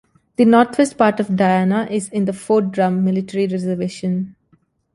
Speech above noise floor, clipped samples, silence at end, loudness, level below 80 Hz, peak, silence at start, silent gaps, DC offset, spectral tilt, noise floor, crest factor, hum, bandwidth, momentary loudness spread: 43 dB; under 0.1%; 0.65 s; -18 LUFS; -58 dBFS; -2 dBFS; 0.4 s; none; under 0.1%; -6.5 dB/octave; -59 dBFS; 16 dB; none; 11.5 kHz; 9 LU